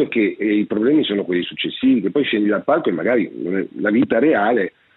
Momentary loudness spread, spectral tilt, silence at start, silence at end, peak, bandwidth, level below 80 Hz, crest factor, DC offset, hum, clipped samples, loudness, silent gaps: 6 LU; -9 dB/octave; 0 s; 0.25 s; -4 dBFS; 4.1 kHz; -64 dBFS; 14 dB; under 0.1%; none; under 0.1%; -18 LUFS; none